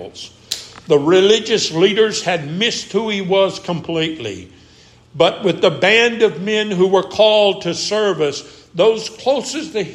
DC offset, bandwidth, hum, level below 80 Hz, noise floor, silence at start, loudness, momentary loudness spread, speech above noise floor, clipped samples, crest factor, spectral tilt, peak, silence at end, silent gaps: under 0.1%; 14 kHz; none; -58 dBFS; -47 dBFS; 0 s; -16 LUFS; 14 LU; 31 dB; under 0.1%; 16 dB; -4 dB/octave; 0 dBFS; 0 s; none